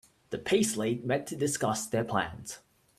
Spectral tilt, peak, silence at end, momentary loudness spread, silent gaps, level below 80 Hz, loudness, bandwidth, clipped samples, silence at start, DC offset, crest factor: -4 dB/octave; -12 dBFS; 0.4 s; 14 LU; none; -62 dBFS; -30 LUFS; 15.5 kHz; under 0.1%; 0.3 s; under 0.1%; 20 dB